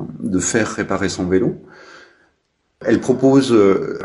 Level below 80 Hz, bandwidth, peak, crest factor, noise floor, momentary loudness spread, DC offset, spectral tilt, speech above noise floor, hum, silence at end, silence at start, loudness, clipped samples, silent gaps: -50 dBFS; 11 kHz; -2 dBFS; 16 dB; -67 dBFS; 10 LU; under 0.1%; -5 dB/octave; 51 dB; none; 0 s; 0 s; -17 LUFS; under 0.1%; none